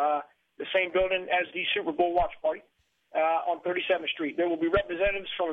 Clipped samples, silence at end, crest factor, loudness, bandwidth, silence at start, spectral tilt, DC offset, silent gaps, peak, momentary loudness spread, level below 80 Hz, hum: under 0.1%; 0 s; 16 dB; -28 LUFS; 4.4 kHz; 0 s; -6.5 dB/octave; under 0.1%; none; -12 dBFS; 6 LU; -50 dBFS; none